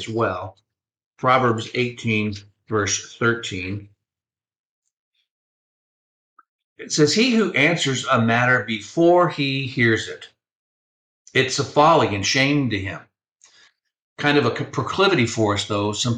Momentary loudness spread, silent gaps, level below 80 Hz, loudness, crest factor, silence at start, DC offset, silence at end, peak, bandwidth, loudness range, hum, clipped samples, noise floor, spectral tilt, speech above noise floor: 12 LU; 1.06-1.11 s, 4.59-4.82 s, 4.93-5.12 s, 5.30-6.36 s, 6.48-6.76 s, 10.52-11.25 s, 13.32-13.36 s, 14.02-14.16 s; -60 dBFS; -20 LUFS; 18 dB; 0 s; under 0.1%; 0 s; -4 dBFS; 9.8 kHz; 9 LU; none; under 0.1%; under -90 dBFS; -4.5 dB/octave; over 70 dB